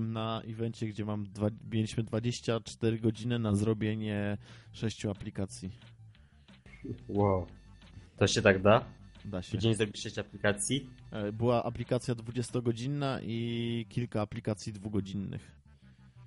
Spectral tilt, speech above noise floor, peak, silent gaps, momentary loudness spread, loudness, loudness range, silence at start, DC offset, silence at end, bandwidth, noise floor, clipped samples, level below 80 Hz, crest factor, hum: -5.5 dB/octave; 26 dB; -10 dBFS; none; 12 LU; -33 LUFS; 7 LU; 0 s; under 0.1%; 0 s; 11.5 kHz; -58 dBFS; under 0.1%; -58 dBFS; 24 dB; none